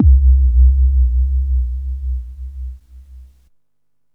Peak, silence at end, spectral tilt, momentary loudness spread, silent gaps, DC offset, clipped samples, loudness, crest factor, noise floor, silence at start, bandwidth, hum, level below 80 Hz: -2 dBFS; 0.9 s; -11.5 dB/octave; 19 LU; none; 0.1%; under 0.1%; -16 LUFS; 12 dB; -75 dBFS; 0 s; 0.3 kHz; none; -14 dBFS